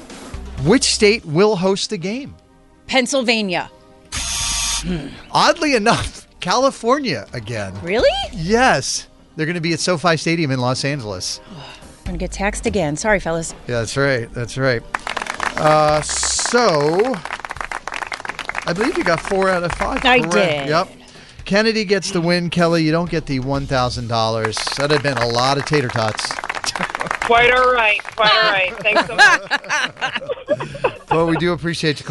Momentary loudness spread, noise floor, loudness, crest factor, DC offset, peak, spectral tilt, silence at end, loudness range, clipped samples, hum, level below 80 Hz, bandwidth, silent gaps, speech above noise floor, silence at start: 12 LU; -44 dBFS; -17 LUFS; 16 dB; under 0.1%; -2 dBFS; -3.5 dB/octave; 0 s; 5 LU; under 0.1%; none; -38 dBFS; 12 kHz; none; 26 dB; 0 s